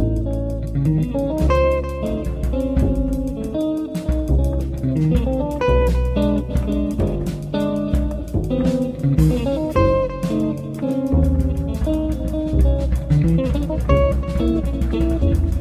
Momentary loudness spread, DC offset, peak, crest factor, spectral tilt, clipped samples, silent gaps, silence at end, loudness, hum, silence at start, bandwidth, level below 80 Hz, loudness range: 6 LU; under 0.1%; -2 dBFS; 16 dB; -8.5 dB/octave; under 0.1%; none; 0 s; -20 LUFS; none; 0 s; 14.5 kHz; -22 dBFS; 2 LU